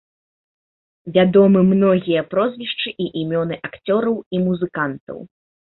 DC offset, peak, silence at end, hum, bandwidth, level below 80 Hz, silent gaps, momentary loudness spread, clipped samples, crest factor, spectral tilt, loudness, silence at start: under 0.1%; -2 dBFS; 0.5 s; none; 4.2 kHz; -56 dBFS; 4.26-4.31 s, 5.00-5.07 s; 14 LU; under 0.1%; 16 dB; -12 dB/octave; -18 LUFS; 1.05 s